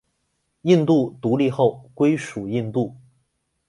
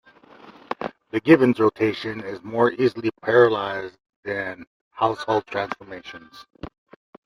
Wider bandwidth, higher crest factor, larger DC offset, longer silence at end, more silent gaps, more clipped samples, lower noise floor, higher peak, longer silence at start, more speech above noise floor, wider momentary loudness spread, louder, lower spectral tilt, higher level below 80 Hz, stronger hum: about the same, 11.5 kHz vs 11.5 kHz; about the same, 18 dB vs 22 dB; neither; first, 0.7 s vs 0.55 s; second, none vs 4.16-4.23 s, 4.67-4.91 s; neither; first, -72 dBFS vs -48 dBFS; about the same, -4 dBFS vs -2 dBFS; first, 0.65 s vs 0.45 s; first, 52 dB vs 27 dB; second, 9 LU vs 23 LU; about the same, -21 LUFS vs -22 LUFS; about the same, -7.5 dB/octave vs -7 dB/octave; about the same, -62 dBFS vs -60 dBFS; neither